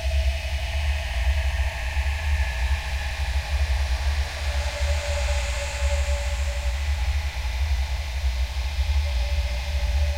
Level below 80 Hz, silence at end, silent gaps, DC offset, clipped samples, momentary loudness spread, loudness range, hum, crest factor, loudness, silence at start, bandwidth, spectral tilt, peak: -24 dBFS; 0 s; none; under 0.1%; under 0.1%; 3 LU; 1 LU; none; 12 dB; -26 LUFS; 0 s; 15.5 kHz; -4 dB/octave; -12 dBFS